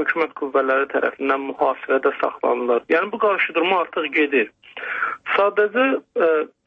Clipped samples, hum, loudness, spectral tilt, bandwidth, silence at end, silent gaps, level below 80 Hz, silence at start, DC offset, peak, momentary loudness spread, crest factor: under 0.1%; none; -20 LUFS; -6 dB/octave; 5.6 kHz; 0.2 s; none; -70 dBFS; 0 s; under 0.1%; -4 dBFS; 5 LU; 16 dB